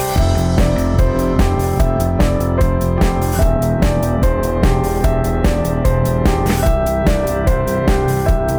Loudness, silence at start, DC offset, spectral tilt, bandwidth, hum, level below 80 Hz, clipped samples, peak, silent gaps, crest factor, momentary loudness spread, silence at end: -16 LUFS; 0 s; under 0.1%; -6.5 dB/octave; over 20 kHz; none; -18 dBFS; under 0.1%; -2 dBFS; none; 12 dB; 1 LU; 0 s